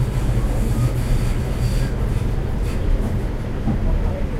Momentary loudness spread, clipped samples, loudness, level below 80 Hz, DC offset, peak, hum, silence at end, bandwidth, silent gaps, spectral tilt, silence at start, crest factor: 3 LU; under 0.1%; -23 LUFS; -22 dBFS; under 0.1%; -8 dBFS; none; 0 s; 14.5 kHz; none; -7 dB/octave; 0 s; 12 dB